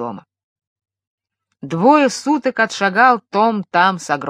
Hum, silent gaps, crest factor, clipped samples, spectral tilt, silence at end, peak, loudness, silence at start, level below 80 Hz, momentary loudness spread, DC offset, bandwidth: none; 0.44-0.56 s, 0.67-0.76 s, 1.07-1.18 s; 16 dB; under 0.1%; -4.5 dB/octave; 0 s; 0 dBFS; -15 LUFS; 0 s; -70 dBFS; 6 LU; under 0.1%; 13 kHz